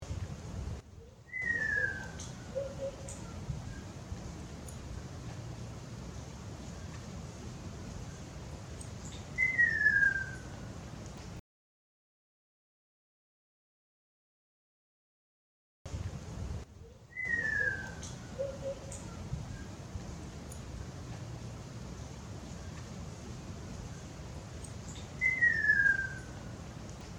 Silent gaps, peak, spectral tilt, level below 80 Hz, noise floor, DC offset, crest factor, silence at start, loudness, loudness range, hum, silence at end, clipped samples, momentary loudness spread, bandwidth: 11.40-15.85 s; -16 dBFS; -4.5 dB/octave; -52 dBFS; under -90 dBFS; under 0.1%; 22 dB; 0 s; -36 LUFS; 15 LU; none; 0 s; under 0.1%; 19 LU; 18 kHz